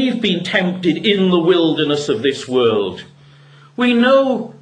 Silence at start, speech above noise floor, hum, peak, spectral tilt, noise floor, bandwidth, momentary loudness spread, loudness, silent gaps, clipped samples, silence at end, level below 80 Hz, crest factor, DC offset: 0 s; 29 dB; none; 0 dBFS; -5.5 dB/octave; -44 dBFS; 10 kHz; 7 LU; -16 LUFS; none; under 0.1%; 0.05 s; -60 dBFS; 16 dB; under 0.1%